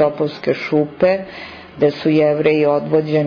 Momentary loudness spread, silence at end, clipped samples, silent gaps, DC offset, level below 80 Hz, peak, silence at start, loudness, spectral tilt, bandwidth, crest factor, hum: 10 LU; 0 s; under 0.1%; none; under 0.1%; -54 dBFS; -4 dBFS; 0 s; -17 LUFS; -8.5 dB/octave; 5.4 kHz; 12 dB; none